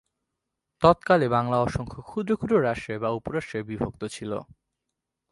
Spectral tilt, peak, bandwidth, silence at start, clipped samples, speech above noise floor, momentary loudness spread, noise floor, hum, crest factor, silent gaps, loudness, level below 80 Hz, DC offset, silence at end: -7 dB/octave; -4 dBFS; 11.5 kHz; 0.8 s; under 0.1%; 59 dB; 13 LU; -84 dBFS; none; 24 dB; none; -25 LUFS; -50 dBFS; under 0.1%; 0.9 s